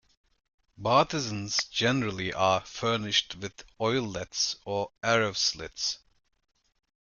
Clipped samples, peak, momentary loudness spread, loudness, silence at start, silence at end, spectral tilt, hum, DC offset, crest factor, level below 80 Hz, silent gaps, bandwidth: under 0.1%; -8 dBFS; 9 LU; -28 LUFS; 0.8 s; 1.1 s; -3 dB/octave; none; under 0.1%; 22 dB; -60 dBFS; none; 11 kHz